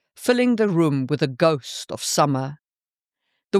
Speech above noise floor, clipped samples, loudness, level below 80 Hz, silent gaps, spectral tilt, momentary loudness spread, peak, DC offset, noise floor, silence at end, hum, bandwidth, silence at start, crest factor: over 69 dB; under 0.1%; -21 LUFS; -70 dBFS; 3.44-3.48 s; -5 dB/octave; 8 LU; -4 dBFS; under 0.1%; under -90 dBFS; 0 s; none; 15 kHz; 0.2 s; 18 dB